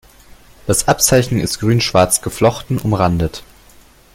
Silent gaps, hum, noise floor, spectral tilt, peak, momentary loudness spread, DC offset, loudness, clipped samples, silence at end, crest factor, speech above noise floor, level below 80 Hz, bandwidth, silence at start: none; none; -46 dBFS; -4.5 dB/octave; 0 dBFS; 8 LU; under 0.1%; -15 LUFS; under 0.1%; 0.7 s; 16 dB; 31 dB; -36 dBFS; 17 kHz; 0.65 s